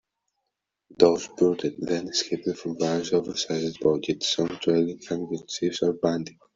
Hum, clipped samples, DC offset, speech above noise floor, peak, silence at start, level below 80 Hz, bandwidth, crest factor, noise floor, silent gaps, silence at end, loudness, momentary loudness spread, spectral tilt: none; under 0.1%; under 0.1%; 57 dB; -2 dBFS; 1 s; -64 dBFS; 7.8 kHz; 24 dB; -82 dBFS; none; 0.25 s; -26 LUFS; 9 LU; -4.5 dB/octave